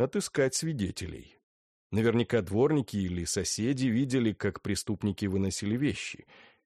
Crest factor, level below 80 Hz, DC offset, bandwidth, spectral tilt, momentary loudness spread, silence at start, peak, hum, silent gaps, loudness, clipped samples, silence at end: 16 dB; -56 dBFS; under 0.1%; 13 kHz; -5 dB/octave; 9 LU; 0 s; -14 dBFS; none; 1.43-1.90 s; -30 LUFS; under 0.1%; 0.5 s